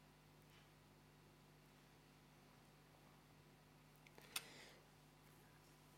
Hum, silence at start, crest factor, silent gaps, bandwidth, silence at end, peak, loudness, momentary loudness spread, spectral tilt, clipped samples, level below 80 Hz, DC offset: 50 Hz at -75 dBFS; 0 s; 36 dB; none; 16 kHz; 0 s; -28 dBFS; -62 LUFS; 17 LU; -2.5 dB/octave; under 0.1%; -80 dBFS; under 0.1%